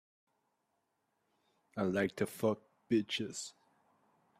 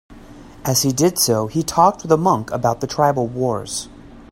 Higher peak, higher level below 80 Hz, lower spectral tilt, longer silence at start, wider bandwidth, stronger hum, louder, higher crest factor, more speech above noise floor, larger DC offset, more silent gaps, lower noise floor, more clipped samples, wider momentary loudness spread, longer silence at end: second, -18 dBFS vs 0 dBFS; second, -78 dBFS vs -46 dBFS; about the same, -5 dB/octave vs -4.5 dB/octave; first, 1.75 s vs 0.1 s; about the same, 15.5 kHz vs 16.5 kHz; neither; second, -36 LUFS vs -18 LUFS; about the same, 20 dB vs 18 dB; first, 47 dB vs 22 dB; neither; neither; first, -82 dBFS vs -40 dBFS; neither; about the same, 11 LU vs 10 LU; first, 0.9 s vs 0.1 s